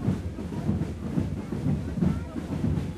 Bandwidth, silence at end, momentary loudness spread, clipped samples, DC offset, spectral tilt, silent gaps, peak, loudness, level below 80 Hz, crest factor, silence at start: 13 kHz; 0 s; 5 LU; under 0.1%; under 0.1%; -8.5 dB/octave; none; -12 dBFS; -30 LUFS; -40 dBFS; 16 dB; 0 s